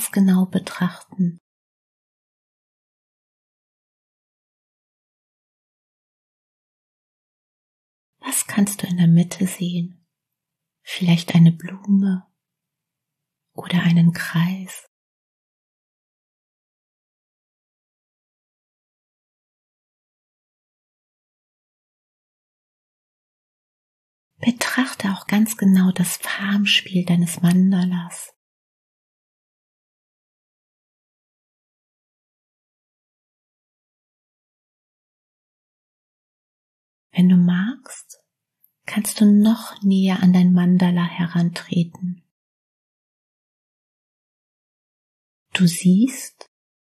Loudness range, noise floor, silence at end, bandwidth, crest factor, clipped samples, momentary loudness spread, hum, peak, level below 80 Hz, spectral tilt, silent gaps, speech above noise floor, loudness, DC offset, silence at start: 12 LU; -83 dBFS; 0.55 s; 13 kHz; 20 dB; under 0.1%; 16 LU; none; -2 dBFS; -72 dBFS; -5.5 dB/octave; 1.40-8.13 s, 14.87-24.31 s, 28.36-37.10 s, 42.31-45.46 s; 65 dB; -19 LUFS; under 0.1%; 0 s